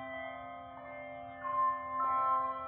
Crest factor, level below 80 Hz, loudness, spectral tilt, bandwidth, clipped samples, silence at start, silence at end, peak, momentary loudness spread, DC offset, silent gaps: 14 dB; -70 dBFS; -35 LUFS; -3 dB/octave; 3.8 kHz; under 0.1%; 0 s; 0 s; -22 dBFS; 15 LU; under 0.1%; none